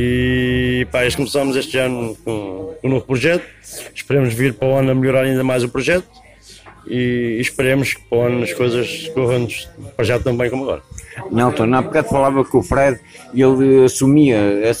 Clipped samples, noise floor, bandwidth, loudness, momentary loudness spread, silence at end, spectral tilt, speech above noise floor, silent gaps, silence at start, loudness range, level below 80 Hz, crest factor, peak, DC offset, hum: under 0.1%; -42 dBFS; 16 kHz; -16 LUFS; 12 LU; 0 s; -6 dB/octave; 25 dB; none; 0 s; 5 LU; -40 dBFS; 14 dB; -2 dBFS; under 0.1%; none